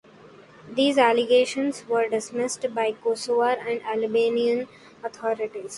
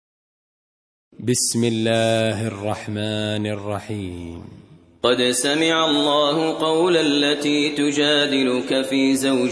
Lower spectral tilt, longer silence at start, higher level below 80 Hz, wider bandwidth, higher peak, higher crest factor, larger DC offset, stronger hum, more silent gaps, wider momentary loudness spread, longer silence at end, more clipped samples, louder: about the same, -3 dB/octave vs -4 dB/octave; second, 0.25 s vs 1.2 s; second, -70 dBFS vs -58 dBFS; about the same, 11.5 kHz vs 11 kHz; second, -6 dBFS vs -2 dBFS; about the same, 20 dB vs 18 dB; neither; neither; neither; about the same, 10 LU vs 11 LU; about the same, 0 s vs 0 s; neither; second, -24 LUFS vs -19 LUFS